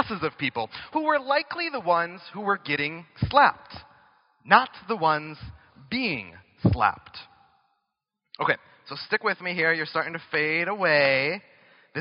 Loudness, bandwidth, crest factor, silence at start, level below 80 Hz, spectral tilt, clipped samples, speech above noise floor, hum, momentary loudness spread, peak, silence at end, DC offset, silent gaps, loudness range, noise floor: -25 LUFS; 5.6 kHz; 26 dB; 0 s; -50 dBFS; -3 dB/octave; under 0.1%; 57 dB; none; 19 LU; 0 dBFS; 0 s; under 0.1%; none; 4 LU; -82 dBFS